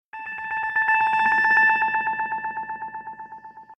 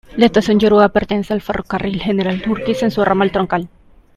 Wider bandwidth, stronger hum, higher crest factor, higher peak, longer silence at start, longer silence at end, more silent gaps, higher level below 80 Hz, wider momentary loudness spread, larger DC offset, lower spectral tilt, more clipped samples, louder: second, 9.4 kHz vs 13 kHz; neither; about the same, 14 dB vs 16 dB; second, -8 dBFS vs 0 dBFS; about the same, 0.15 s vs 0.1 s; second, 0.05 s vs 0.5 s; neither; second, -68 dBFS vs -40 dBFS; first, 20 LU vs 9 LU; neither; second, -3.5 dB/octave vs -6.5 dB/octave; neither; second, -21 LUFS vs -16 LUFS